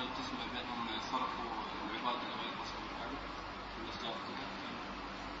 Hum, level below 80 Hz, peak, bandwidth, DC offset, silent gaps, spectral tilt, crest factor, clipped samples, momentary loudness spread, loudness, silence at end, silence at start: none; -58 dBFS; -24 dBFS; 7.6 kHz; under 0.1%; none; -1.5 dB/octave; 18 dB; under 0.1%; 6 LU; -41 LUFS; 0 s; 0 s